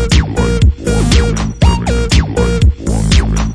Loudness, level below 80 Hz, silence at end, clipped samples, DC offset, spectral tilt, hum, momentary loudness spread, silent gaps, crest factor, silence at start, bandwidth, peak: -13 LUFS; -14 dBFS; 0 s; under 0.1%; under 0.1%; -5.5 dB/octave; none; 3 LU; none; 10 dB; 0 s; 11 kHz; 0 dBFS